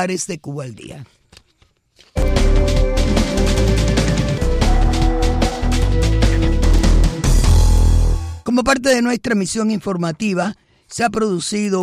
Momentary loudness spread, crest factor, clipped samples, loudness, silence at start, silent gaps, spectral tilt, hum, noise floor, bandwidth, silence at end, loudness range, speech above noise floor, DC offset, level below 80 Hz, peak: 10 LU; 12 dB; under 0.1%; -17 LUFS; 0 s; none; -5.5 dB/octave; none; -58 dBFS; 13.5 kHz; 0 s; 3 LU; 40 dB; under 0.1%; -18 dBFS; -4 dBFS